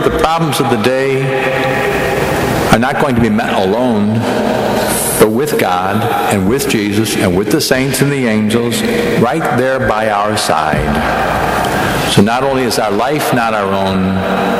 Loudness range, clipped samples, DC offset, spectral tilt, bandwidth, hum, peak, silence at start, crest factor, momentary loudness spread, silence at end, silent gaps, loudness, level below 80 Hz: 1 LU; under 0.1%; under 0.1%; -5 dB/octave; 16 kHz; none; 0 dBFS; 0 s; 12 dB; 3 LU; 0 s; none; -13 LUFS; -34 dBFS